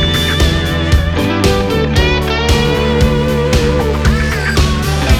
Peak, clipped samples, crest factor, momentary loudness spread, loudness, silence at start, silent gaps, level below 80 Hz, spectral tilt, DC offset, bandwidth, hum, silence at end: 0 dBFS; under 0.1%; 12 dB; 2 LU; -13 LUFS; 0 s; none; -18 dBFS; -5.5 dB/octave; under 0.1%; 16 kHz; none; 0 s